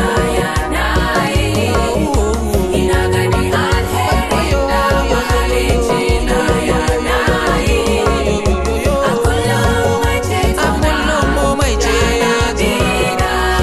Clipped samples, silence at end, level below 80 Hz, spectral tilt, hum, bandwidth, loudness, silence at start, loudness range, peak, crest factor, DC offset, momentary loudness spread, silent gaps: under 0.1%; 0 s; -20 dBFS; -5 dB/octave; none; 14.5 kHz; -14 LUFS; 0 s; 1 LU; 0 dBFS; 12 dB; under 0.1%; 2 LU; none